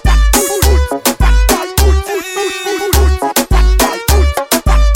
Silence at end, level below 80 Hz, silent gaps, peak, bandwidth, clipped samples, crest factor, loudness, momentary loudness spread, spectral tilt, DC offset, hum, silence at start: 0 s; -12 dBFS; none; 0 dBFS; 17 kHz; under 0.1%; 10 dB; -12 LUFS; 6 LU; -4 dB/octave; under 0.1%; none; 0.05 s